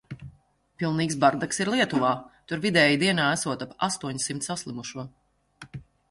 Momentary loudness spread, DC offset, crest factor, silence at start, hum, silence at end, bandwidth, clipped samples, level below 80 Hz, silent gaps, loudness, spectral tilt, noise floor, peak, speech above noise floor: 23 LU; under 0.1%; 22 dB; 0.1 s; none; 0.3 s; 11.5 kHz; under 0.1%; -60 dBFS; none; -25 LUFS; -4 dB/octave; -60 dBFS; -6 dBFS; 34 dB